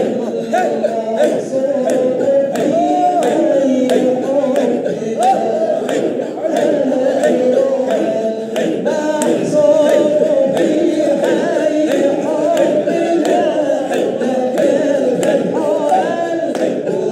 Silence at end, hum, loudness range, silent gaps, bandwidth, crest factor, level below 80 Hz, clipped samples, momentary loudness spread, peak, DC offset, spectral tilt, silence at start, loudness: 0 s; none; 2 LU; none; 14.5 kHz; 14 dB; -70 dBFS; under 0.1%; 4 LU; 0 dBFS; under 0.1%; -5.5 dB/octave; 0 s; -15 LUFS